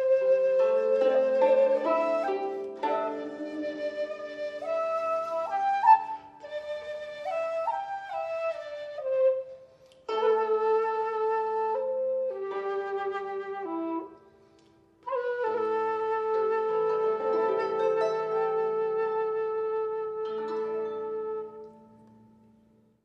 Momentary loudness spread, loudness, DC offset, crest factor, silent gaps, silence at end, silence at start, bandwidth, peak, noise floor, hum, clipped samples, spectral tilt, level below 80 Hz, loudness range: 12 LU; -28 LUFS; under 0.1%; 20 dB; none; 1.2 s; 0 s; 7.6 kHz; -8 dBFS; -62 dBFS; none; under 0.1%; -5 dB/octave; -76 dBFS; 6 LU